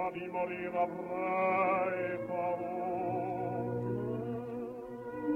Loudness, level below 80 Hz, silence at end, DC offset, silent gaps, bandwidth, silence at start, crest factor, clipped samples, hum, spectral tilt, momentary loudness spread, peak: -35 LUFS; -68 dBFS; 0 s; under 0.1%; none; 7 kHz; 0 s; 16 dB; under 0.1%; none; -9 dB/octave; 9 LU; -20 dBFS